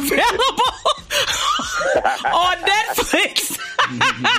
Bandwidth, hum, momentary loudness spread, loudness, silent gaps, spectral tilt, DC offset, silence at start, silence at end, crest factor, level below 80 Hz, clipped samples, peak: 15.5 kHz; none; 3 LU; -17 LUFS; none; -1.5 dB/octave; under 0.1%; 0 s; 0 s; 18 dB; -44 dBFS; under 0.1%; -2 dBFS